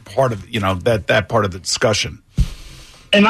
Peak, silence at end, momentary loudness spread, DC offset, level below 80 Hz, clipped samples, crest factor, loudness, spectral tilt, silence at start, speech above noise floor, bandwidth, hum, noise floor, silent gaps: -4 dBFS; 0 s; 7 LU; under 0.1%; -30 dBFS; under 0.1%; 14 dB; -19 LUFS; -4.5 dB/octave; 0.05 s; 21 dB; 14 kHz; none; -39 dBFS; none